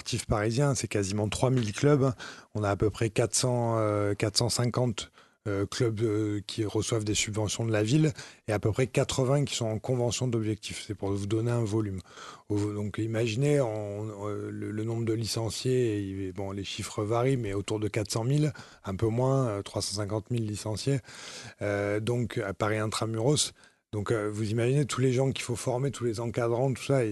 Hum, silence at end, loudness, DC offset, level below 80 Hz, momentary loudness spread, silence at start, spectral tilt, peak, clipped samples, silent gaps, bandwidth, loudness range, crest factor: none; 0 s; -29 LUFS; under 0.1%; -54 dBFS; 9 LU; 0.05 s; -5.5 dB/octave; -8 dBFS; under 0.1%; none; 12 kHz; 4 LU; 22 dB